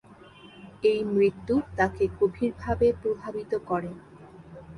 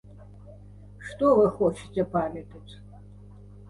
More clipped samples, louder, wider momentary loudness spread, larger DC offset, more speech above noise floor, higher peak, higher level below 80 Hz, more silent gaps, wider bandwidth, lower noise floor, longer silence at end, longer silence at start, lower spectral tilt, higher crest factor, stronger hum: neither; about the same, -27 LUFS vs -25 LUFS; second, 22 LU vs 26 LU; neither; about the same, 24 dB vs 22 dB; about the same, -10 dBFS vs -10 dBFS; about the same, -48 dBFS vs -52 dBFS; neither; about the same, 10.5 kHz vs 11.5 kHz; about the same, -50 dBFS vs -47 dBFS; second, 0 s vs 0.7 s; first, 0.45 s vs 0.2 s; about the same, -7.5 dB/octave vs -7.5 dB/octave; about the same, 18 dB vs 18 dB; second, none vs 50 Hz at -45 dBFS